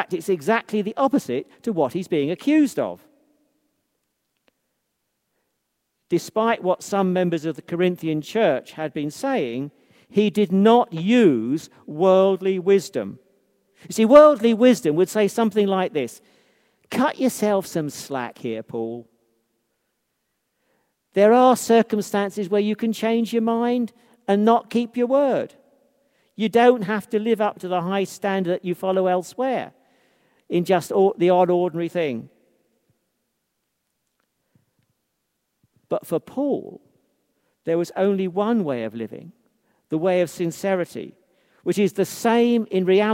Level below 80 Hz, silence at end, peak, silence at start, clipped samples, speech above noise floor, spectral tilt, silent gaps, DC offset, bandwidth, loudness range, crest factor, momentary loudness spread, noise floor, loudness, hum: -70 dBFS; 0 s; 0 dBFS; 0 s; under 0.1%; 56 dB; -6 dB/octave; none; under 0.1%; 16 kHz; 11 LU; 22 dB; 13 LU; -76 dBFS; -21 LUFS; none